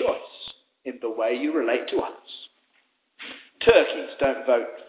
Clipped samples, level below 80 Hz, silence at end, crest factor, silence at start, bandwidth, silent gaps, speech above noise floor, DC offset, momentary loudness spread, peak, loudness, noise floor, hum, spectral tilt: under 0.1%; -56 dBFS; 0.05 s; 22 dB; 0 s; 4 kHz; none; 45 dB; under 0.1%; 21 LU; -4 dBFS; -24 LUFS; -68 dBFS; none; -8.5 dB/octave